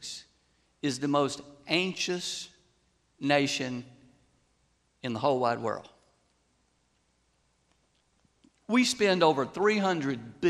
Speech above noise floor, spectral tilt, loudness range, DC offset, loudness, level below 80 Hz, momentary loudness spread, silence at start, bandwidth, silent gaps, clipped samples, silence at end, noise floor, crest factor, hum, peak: 44 dB; -4 dB/octave; 6 LU; under 0.1%; -28 LUFS; -70 dBFS; 15 LU; 0 s; 13 kHz; none; under 0.1%; 0 s; -72 dBFS; 22 dB; none; -8 dBFS